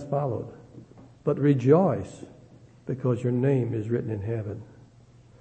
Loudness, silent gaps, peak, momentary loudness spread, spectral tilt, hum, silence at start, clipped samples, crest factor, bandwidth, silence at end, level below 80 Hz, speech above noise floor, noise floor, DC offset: -26 LUFS; none; -6 dBFS; 21 LU; -9.5 dB/octave; none; 0 s; under 0.1%; 20 dB; 8.6 kHz; 0.7 s; -62 dBFS; 29 dB; -54 dBFS; under 0.1%